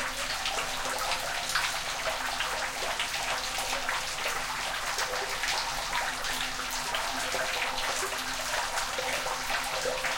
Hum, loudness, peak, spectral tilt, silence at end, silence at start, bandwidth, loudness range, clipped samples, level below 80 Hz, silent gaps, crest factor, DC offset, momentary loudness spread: none; -30 LUFS; -12 dBFS; 0 dB/octave; 0 s; 0 s; 17 kHz; 0 LU; under 0.1%; -48 dBFS; none; 18 dB; under 0.1%; 2 LU